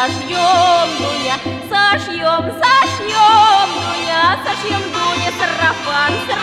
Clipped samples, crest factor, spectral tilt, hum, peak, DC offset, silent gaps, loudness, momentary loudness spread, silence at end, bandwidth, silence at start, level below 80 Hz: under 0.1%; 12 dB; -3 dB/octave; none; -2 dBFS; under 0.1%; none; -14 LUFS; 8 LU; 0 s; 14.5 kHz; 0 s; -54 dBFS